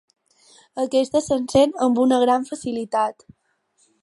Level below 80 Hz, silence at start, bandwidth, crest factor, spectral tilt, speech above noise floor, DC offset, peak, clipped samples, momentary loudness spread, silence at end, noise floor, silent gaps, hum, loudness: -56 dBFS; 0.75 s; 11.5 kHz; 18 dB; -5 dB/octave; 45 dB; under 0.1%; -4 dBFS; under 0.1%; 10 LU; 0.9 s; -65 dBFS; none; none; -20 LUFS